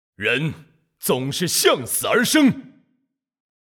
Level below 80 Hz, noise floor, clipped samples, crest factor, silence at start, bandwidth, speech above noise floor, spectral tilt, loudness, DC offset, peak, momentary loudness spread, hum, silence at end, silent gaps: -62 dBFS; -72 dBFS; under 0.1%; 18 dB; 0.2 s; over 20 kHz; 52 dB; -3.5 dB/octave; -19 LUFS; under 0.1%; -4 dBFS; 10 LU; none; 1 s; none